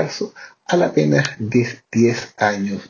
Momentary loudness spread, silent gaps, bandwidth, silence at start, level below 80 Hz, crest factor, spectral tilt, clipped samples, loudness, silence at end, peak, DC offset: 10 LU; none; 7.4 kHz; 0 s; -58 dBFS; 18 dB; -6 dB/octave; under 0.1%; -19 LUFS; 0 s; 0 dBFS; under 0.1%